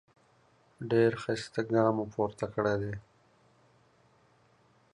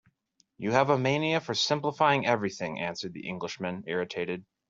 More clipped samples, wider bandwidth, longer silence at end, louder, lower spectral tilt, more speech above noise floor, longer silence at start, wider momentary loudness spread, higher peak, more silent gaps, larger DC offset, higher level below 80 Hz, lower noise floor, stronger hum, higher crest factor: neither; first, 11 kHz vs 7.8 kHz; first, 1.95 s vs 0.25 s; about the same, -30 LUFS vs -29 LUFS; first, -7 dB/octave vs -4.5 dB/octave; second, 36 dB vs 42 dB; first, 0.8 s vs 0.6 s; about the same, 11 LU vs 11 LU; second, -12 dBFS vs -8 dBFS; neither; neither; first, -64 dBFS vs -70 dBFS; second, -66 dBFS vs -71 dBFS; neither; about the same, 20 dB vs 22 dB